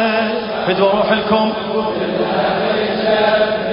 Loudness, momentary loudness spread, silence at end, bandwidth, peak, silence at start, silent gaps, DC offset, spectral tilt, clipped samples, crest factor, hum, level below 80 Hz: -16 LUFS; 5 LU; 0 s; 5.4 kHz; 0 dBFS; 0 s; none; under 0.1%; -10 dB/octave; under 0.1%; 14 dB; none; -48 dBFS